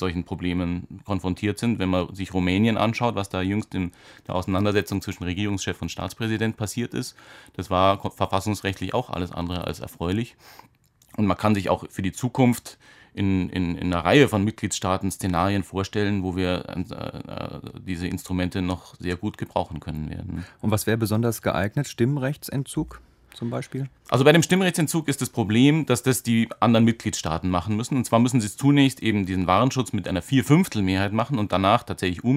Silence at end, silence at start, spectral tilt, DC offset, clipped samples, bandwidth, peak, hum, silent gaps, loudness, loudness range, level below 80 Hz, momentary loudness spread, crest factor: 0 s; 0 s; -5.5 dB/octave; under 0.1%; under 0.1%; 16 kHz; -2 dBFS; none; none; -24 LUFS; 7 LU; -50 dBFS; 13 LU; 20 dB